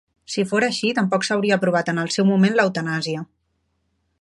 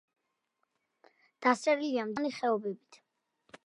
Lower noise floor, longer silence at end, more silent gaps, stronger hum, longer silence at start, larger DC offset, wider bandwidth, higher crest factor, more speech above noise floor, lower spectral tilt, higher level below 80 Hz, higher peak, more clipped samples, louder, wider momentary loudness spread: second, -70 dBFS vs -81 dBFS; first, 0.95 s vs 0.1 s; neither; neither; second, 0.3 s vs 1.4 s; neither; about the same, 11.5 kHz vs 11.5 kHz; about the same, 18 dB vs 22 dB; about the same, 50 dB vs 50 dB; about the same, -5 dB/octave vs -4.5 dB/octave; first, -66 dBFS vs -82 dBFS; first, -4 dBFS vs -12 dBFS; neither; first, -20 LUFS vs -31 LUFS; about the same, 10 LU vs 9 LU